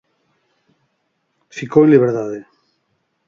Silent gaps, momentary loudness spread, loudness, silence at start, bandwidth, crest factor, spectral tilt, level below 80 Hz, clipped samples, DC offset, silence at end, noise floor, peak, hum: none; 21 LU; -14 LUFS; 1.55 s; 7.4 kHz; 18 dB; -8.5 dB/octave; -64 dBFS; under 0.1%; under 0.1%; 0.85 s; -69 dBFS; 0 dBFS; none